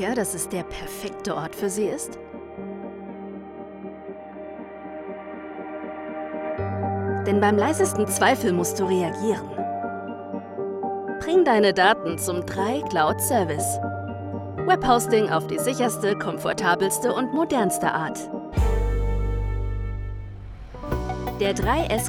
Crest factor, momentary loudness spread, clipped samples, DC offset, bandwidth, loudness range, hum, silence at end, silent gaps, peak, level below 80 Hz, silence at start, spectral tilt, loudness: 20 dB; 17 LU; under 0.1%; under 0.1%; over 20 kHz; 12 LU; none; 0 s; none; -4 dBFS; -36 dBFS; 0 s; -4.5 dB/octave; -24 LUFS